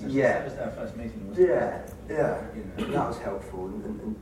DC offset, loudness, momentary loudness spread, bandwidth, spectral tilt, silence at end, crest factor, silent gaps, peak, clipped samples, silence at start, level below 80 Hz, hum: under 0.1%; -29 LUFS; 13 LU; 14.5 kHz; -7 dB/octave; 0 s; 18 dB; none; -10 dBFS; under 0.1%; 0 s; -48 dBFS; none